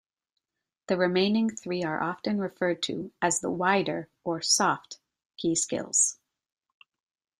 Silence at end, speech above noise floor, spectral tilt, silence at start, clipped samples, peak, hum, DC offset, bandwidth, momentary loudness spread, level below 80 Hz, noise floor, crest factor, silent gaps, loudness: 1.25 s; 60 dB; -3 dB/octave; 0.9 s; under 0.1%; -10 dBFS; none; under 0.1%; 15 kHz; 9 LU; -70 dBFS; -87 dBFS; 20 dB; 5.26-5.30 s; -27 LUFS